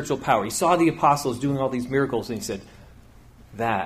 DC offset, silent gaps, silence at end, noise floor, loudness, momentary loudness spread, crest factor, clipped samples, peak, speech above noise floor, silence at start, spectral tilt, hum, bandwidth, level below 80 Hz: under 0.1%; none; 0 s; -49 dBFS; -23 LUFS; 11 LU; 18 dB; under 0.1%; -6 dBFS; 26 dB; 0 s; -5 dB/octave; none; 15.5 kHz; -52 dBFS